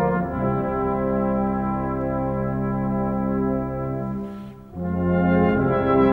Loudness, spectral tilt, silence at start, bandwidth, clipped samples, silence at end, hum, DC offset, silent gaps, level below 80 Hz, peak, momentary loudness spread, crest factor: -23 LUFS; -10.5 dB/octave; 0 s; 4.4 kHz; under 0.1%; 0 s; 50 Hz at -40 dBFS; under 0.1%; none; -40 dBFS; -8 dBFS; 10 LU; 14 dB